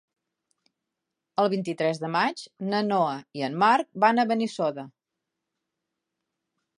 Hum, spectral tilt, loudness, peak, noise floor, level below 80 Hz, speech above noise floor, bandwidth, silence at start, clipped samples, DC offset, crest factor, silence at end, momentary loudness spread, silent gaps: none; -5.5 dB/octave; -25 LUFS; -6 dBFS; -85 dBFS; -82 dBFS; 60 dB; 11 kHz; 1.4 s; under 0.1%; under 0.1%; 22 dB; 1.9 s; 11 LU; none